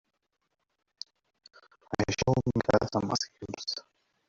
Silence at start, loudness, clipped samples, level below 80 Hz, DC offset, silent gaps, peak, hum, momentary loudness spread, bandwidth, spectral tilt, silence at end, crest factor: 1.9 s; -30 LUFS; under 0.1%; -56 dBFS; under 0.1%; none; -10 dBFS; none; 18 LU; 7.8 kHz; -5 dB/octave; 0.5 s; 22 dB